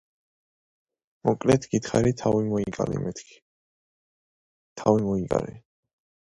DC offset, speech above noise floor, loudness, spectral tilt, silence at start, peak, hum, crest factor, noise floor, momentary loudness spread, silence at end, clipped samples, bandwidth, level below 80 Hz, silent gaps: under 0.1%; over 66 dB; -25 LUFS; -6.5 dB/octave; 1.25 s; -4 dBFS; none; 22 dB; under -90 dBFS; 8 LU; 0.7 s; under 0.1%; 11.5 kHz; -52 dBFS; 3.42-4.76 s